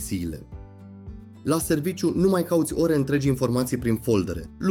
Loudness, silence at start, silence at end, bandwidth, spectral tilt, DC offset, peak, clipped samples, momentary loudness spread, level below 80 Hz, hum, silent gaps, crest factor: -24 LUFS; 0 s; 0 s; 17.5 kHz; -6 dB/octave; under 0.1%; -8 dBFS; under 0.1%; 21 LU; -44 dBFS; none; none; 16 dB